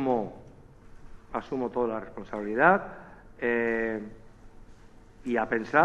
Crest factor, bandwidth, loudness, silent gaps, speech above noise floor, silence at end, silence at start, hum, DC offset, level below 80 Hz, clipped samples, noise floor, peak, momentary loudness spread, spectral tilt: 24 dB; 8.6 kHz; -28 LUFS; none; 24 dB; 0 s; 0 s; none; under 0.1%; -54 dBFS; under 0.1%; -51 dBFS; -6 dBFS; 19 LU; -7.5 dB/octave